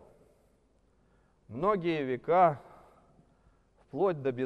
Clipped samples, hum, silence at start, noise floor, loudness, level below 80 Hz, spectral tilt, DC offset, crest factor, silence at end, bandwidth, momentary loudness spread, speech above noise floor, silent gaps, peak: under 0.1%; none; 1.5 s; -68 dBFS; -29 LUFS; -66 dBFS; -8.5 dB/octave; under 0.1%; 20 dB; 0 s; 6.2 kHz; 18 LU; 40 dB; none; -12 dBFS